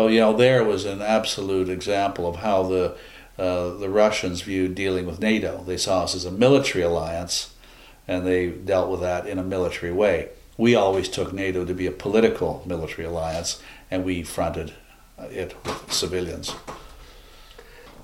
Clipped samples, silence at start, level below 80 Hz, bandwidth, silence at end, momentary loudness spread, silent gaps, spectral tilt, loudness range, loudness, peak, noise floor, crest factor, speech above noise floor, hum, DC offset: under 0.1%; 0 s; -46 dBFS; 16.5 kHz; 0 s; 14 LU; none; -4.5 dB/octave; 7 LU; -23 LUFS; -4 dBFS; -48 dBFS; 20 dB; 25 dB; none; under 0.1%